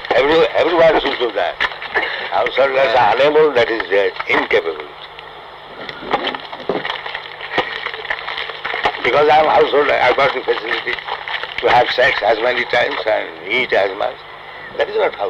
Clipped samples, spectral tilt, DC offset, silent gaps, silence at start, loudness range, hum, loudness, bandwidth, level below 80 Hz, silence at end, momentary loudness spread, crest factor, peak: under 0.1%; -4.5 dB/octave; under 0.1%; none; 0 s; 8 LU; none; -16 LUFS; 8.2 kHz; -48 dBFS; 0 s; 15 LU; 12 dB; -4 dBFS